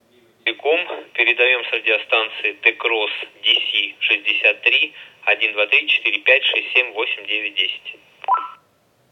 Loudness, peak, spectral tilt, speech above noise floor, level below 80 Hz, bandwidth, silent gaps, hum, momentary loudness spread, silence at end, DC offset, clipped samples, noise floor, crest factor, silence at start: -17 LUFS; 0 dBFS; -1.5 dB/octave; 40 dB; -82 dBFS; 6.6 kHz; none; none; 9 LU; 0.6 s; under 0.1%; under 0.1%; -59 dBFS; 20 dB; 0.45 s